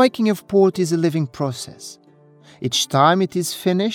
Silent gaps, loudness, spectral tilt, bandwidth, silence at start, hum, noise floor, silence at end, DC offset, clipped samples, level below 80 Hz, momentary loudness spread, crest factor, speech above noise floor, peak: none; -19 LUFS; -5 dB/octave; 17.5 kHz; 0 s; none; -49 dBFS; 0 s; under 0.1%; under 0.1%; -62 dBFS; 16 LU; 18 dB; 30 dB; -2 dBFS